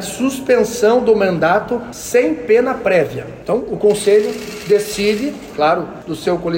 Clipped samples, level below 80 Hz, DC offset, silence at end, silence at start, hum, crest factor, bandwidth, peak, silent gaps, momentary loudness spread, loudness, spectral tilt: under 0.1%; -48 dBFS; under 0.1%; 0 s; 0 s; none; 12 dB; 16.5 kHz; -4 dBFS; none; 9 LU; -16 LUFS; -4.5 dB/octave